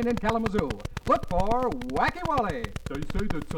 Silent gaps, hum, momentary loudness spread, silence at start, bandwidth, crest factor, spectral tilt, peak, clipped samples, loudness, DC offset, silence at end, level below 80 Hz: none; none; 9 LU; 0 s; 15.5 kHz; 18 dB; -6.5 dB/octave; -10 dBFS; under 0.1%; -28 LUFS; under 0.1%; 0 s; -38 dBFS